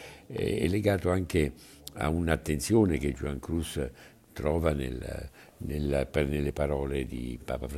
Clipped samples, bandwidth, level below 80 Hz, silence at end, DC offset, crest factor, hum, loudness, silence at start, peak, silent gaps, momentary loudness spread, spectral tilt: under 0.1%; 15.5 kHz; -42 dBFS; 0 s; under 0.1%; 20 dB; none; -30 LUFS; 0 s; -10 dBFS; none; 13 LU; -6.5 dB/octave